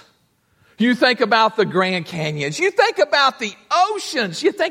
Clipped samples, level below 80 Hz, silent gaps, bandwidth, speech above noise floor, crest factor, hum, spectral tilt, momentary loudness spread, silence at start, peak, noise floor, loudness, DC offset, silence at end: under 0.1%; -68 dBFS; none; 16 kHz; 44 dB; 18 dB; none; -4 dB/octave; 7 LU; 0.8 s; -2 dBFS; -62 dBFS; -18 LUFS; under 0.1%; 0 s